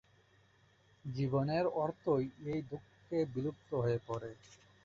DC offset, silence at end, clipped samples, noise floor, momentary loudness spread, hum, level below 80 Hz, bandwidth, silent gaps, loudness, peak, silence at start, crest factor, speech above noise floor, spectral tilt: under 0.1%; 0.3 s; under 0.1%; -68 dBFS; 15 LU; none; -66 dBFS; 7.4 kHz; none; -37 LUFS; -20 dBFS; 1.05 s; 16 dB; 32 dB; -7.5 dB/octave